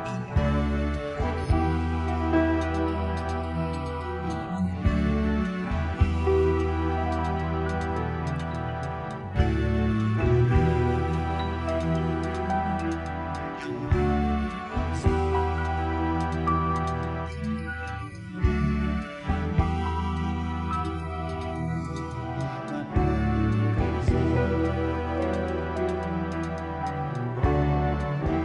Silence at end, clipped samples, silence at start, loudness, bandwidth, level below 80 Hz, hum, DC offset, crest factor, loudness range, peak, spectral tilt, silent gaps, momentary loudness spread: 0 s; under 0.1%; 0 s; -27 LUFS; 10.5 kHz; -34 dBFS; none; under 0.1%; 16 dB; 3 LU; -10 dBFS; -8 dB/octave; none; 8 LU